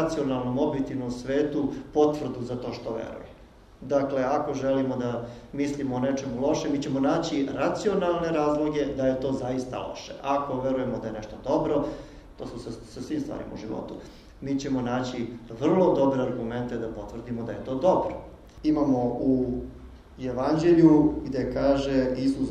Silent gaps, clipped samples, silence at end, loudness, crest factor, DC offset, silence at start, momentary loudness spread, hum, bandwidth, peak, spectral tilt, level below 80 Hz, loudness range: none; under 0.1%; 0 s; -27 LUFS; 20 dB; under 0.1%; 0 s; 13 LU; none; 9.6 kHz; -6 dBFS; -7 dB/octave; -48 dBFS; 7 LU